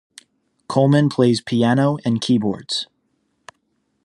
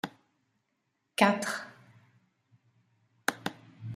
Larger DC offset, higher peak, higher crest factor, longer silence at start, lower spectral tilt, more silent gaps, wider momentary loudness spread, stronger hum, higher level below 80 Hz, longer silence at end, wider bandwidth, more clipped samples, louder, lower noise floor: neither; first, -2 dBFS vs -6 dBFS; second, 18 dB vs 28 dB; first, 0.7 s vs 0.05 s; first, -6.5 dB/octave vs -4 dB/octave; neither; second, 9 LU vs 18 LU; neither; first, -62 dBFS vs -78 dBFS; first, 1.2 s vs 0 s; second, 11 kHz vs 15 kHz; neither; first, -18 LUFS vs -31 LUFS; second, -68 dBFS vs -79 dBFS